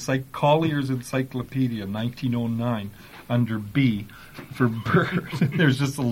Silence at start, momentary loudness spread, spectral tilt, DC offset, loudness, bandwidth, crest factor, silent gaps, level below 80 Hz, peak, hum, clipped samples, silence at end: 0 s; 11 LU; -6.5 dB/octave; under 0.1%; -24 LUFS; 16.5 kHz; 18 dB; none; -52 dBFS; -6 dBFS; none; under 0.1%; 0 s